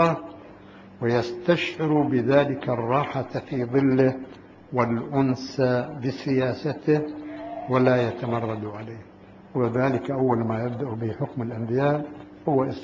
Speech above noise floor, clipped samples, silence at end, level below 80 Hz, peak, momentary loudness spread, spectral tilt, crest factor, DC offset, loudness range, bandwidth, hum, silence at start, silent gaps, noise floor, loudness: 22 dB; under 0.1%; 0 s; -58 dBFS; -6 dBFS; 13 LU; -8 dB/octave; 18 dB; under 0.1%; 3 LU; 7.6 kHz; none; 0 s; none; -46 dBFS; -25 LUFS